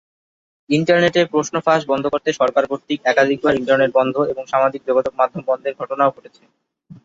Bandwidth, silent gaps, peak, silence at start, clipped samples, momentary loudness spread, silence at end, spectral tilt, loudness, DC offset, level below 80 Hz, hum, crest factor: 8 kHz; none; -2 dBFS; 0.7 s; under 0.1%; 6 LU; 0.1 s; -5 dB/octave; -18 LUFS; under 0.1%; -58 dBFS; none; 16 dB